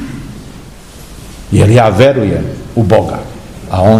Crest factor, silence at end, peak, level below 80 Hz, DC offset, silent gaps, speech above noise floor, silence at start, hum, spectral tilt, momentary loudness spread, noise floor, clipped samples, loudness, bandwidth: 12 dB; 0 s; 0 dBFS; -32 dBFS; 0.6%; none; 23 dB; 0 s; none; -7 dB/octave; 24 LU; -32 dBFS; 2%; -10 LUFS; 14 kHz